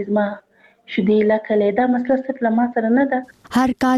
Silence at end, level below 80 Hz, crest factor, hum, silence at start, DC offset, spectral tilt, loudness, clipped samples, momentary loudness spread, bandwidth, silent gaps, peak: 0 s; -54 dBFS; 12 dB; none; 0 s; under 0.1%; -7 dB/octave; -19 LUFS; under 0.1%; 8 LU; 12.5 kHz; none; -6 dBFS